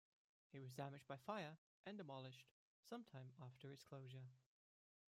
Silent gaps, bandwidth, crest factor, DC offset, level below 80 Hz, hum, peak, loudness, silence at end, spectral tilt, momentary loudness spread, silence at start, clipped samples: 1.58-1.84 s, 2.51-2.83 s; 16 kHz; 22 dB; under 0.1%; under -90 dBFS; none; -36 dBFS; -57 LUFS; 0.7 s; -6 dB/octave; 9 LU; 0.55 s; under 0.1%